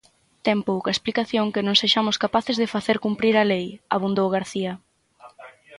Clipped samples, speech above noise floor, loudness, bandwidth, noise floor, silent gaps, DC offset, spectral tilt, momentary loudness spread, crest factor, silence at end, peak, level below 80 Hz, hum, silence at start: under 0.1%; 28 dB; -22 LUFS; 11.5 kHz; -50 dBFS; none; under 0.1%; -4.5 dB/octave; 8 LU; 20 dB; 0 s; -4 dBFS; -62 dBFS; none; 0.45 s